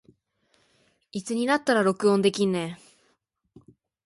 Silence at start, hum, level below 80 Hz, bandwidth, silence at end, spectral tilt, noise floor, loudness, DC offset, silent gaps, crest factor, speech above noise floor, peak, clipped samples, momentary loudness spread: 1.15 s; none; -70 dBFS; 11.5 kHz; 1.3 s; -5 dB/octave; -71 dBFS; -24 LUFS; under 0.1%; none; 20 dB; 48 dB; -8 dBFS; under 0.1%; 15 LU